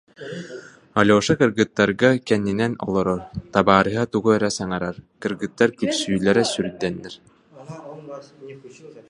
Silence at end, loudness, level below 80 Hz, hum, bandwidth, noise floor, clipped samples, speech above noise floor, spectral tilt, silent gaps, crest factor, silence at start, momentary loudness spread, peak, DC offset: 0.1 s; -20 LUFS; -52 dBFS; none; 11.5 kHz; -40 dBFS; under 0.1%; 19 dB; -5 dB/octave; none; 22 dB; 0.2 s; 22 LU; 0 dBFS; under 0.1%